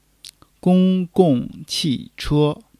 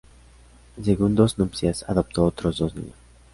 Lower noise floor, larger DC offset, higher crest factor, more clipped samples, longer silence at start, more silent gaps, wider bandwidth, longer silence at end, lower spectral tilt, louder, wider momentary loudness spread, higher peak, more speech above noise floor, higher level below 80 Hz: second, -46 dBFS vs -50 dBFS; neither; about the same, 18 dB vs 20 dB; neither; about the same, 0.65 s vs 0.75 s; neither; first, 13.5 kHz vs 11.5 kHz; second, 0.25 s vs 0.45 s; about the same, -6.5 dB/octave vs -7 dB/octave; first, -19 LUFS vs -23 LUFS; about the same, 8 LU vs 10 LU; first, 0 dBFS vs -4 dBFS; about the same, 28 dB vs 28 dB; about the same, -44 dBFS vs -40 dBFS